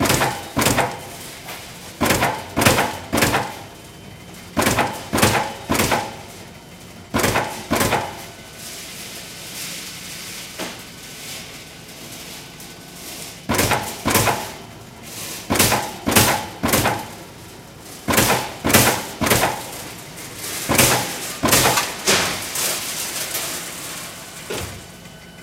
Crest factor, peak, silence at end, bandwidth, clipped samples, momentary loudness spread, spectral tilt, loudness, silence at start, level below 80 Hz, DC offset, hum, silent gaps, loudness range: 22 dB; 0 dBFS; 0 s; 17 kHz; under 0.1%; 20 LU; -3 dB/octave; -19 LUFS; 0 s; -42 dBFS; under 0.1%; none; none; 12 LU